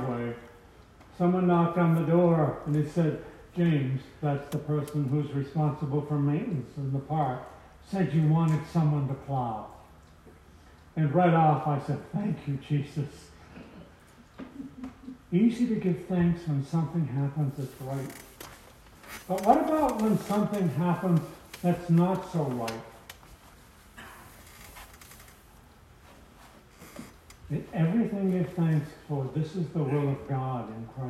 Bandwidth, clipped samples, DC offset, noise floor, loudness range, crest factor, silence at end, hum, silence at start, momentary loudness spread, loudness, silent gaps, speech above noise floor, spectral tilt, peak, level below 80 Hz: 13.5 kHz; under 0.1%; under 0.1%; -54 dBFS; 9 LU; 22 dB; 0 s; none; 0 s; 23 LU; -28 LUFS; none; 27 dB; -8.5 dB/octave; -8 dBFS; -58 dBFS